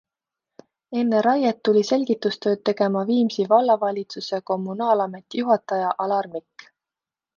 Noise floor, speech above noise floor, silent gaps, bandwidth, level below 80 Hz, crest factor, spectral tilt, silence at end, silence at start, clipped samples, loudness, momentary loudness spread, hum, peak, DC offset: -89 dBFS; 68 dB; none; 7.2 kHz; -72 dBFS; 18 dB; -6 dB/octave; 1 s; 0.9 s; under 0.1%; -22 LUFS; 9 LU; none; -4 dBFS; under 0.1%